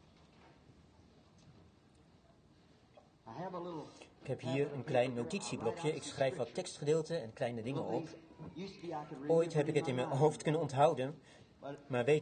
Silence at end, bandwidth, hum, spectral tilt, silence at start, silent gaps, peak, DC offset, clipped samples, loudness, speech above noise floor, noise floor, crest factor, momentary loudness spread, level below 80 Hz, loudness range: 0 s; 9.6 kHz; none; -6 dB/octave; 1.45 s; none; -16 dBFS; under 0.1%; under 0.1%; -37 LUFS; 29 dB; -65 dBFS; 22 dB; 18 LU; -72 dBFS; 15 LU